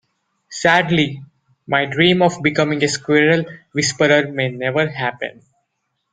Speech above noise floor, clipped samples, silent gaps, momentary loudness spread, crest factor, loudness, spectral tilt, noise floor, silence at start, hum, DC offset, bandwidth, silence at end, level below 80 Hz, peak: 56 dB; under 0.1%; none; 10 LU; 18 dB; -17 LUFS; -4.5 dB/octave; -73 dBFS; 0.5 s; none; under 0.1%; 9.6 kHz; 0.85 s; -56 dBFS; -2 dBFS